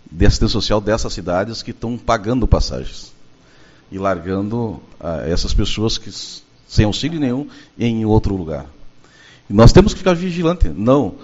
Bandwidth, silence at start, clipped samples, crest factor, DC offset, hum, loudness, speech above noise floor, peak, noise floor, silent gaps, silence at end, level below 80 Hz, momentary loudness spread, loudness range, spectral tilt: 8 kHz; 0.1 s; under 0.1%; 16 dB; under 0.1%; none; -17 LUFS; 31 dB; 0 dBFS; -46 dBFS; none; 0 s; -24 dBFS; 14 LU; 7 LU; -6 dB/octave